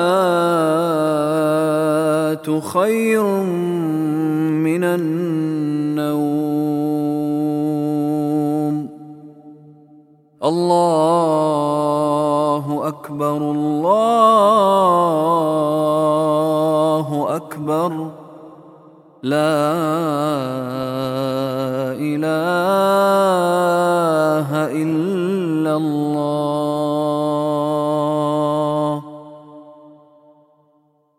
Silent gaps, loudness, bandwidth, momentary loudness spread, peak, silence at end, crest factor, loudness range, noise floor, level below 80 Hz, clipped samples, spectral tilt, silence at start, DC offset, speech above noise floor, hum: none; -18 LUFS; 16 kHz; 8 LU; -2 dBFS; 1.3 s; 16 dB; 6 LU; -59 dBFS; -70 dBFS; under 0.1%; -6.5 dB/octave; 0 s; under 0.1%; 43 dB; none